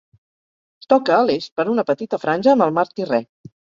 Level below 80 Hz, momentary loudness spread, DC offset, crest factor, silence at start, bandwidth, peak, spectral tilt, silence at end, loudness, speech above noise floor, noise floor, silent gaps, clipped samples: -66 dBFS; 7 LU; under 0.1%; 18 dB; 0.9 s; 7.4 kHz; -2 dBFS; -6.5 dB/octave; 0.55 s; -18 LUFS; over 72 dB; under -90 dBFS; 1.52-1.56 s; under 0.1%